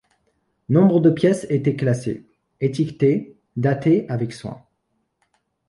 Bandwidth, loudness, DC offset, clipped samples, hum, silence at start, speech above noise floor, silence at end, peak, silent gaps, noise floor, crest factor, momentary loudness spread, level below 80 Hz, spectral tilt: 11.5 kHz; -20 LUFS; under 0.1%; under 0.1%; none; 0.7 s; 53 dB; 1.1 s; -4 dBFS; none; -72 dBFS; 18 dB; 14 LU; -58 dBFS; -8 dB/octave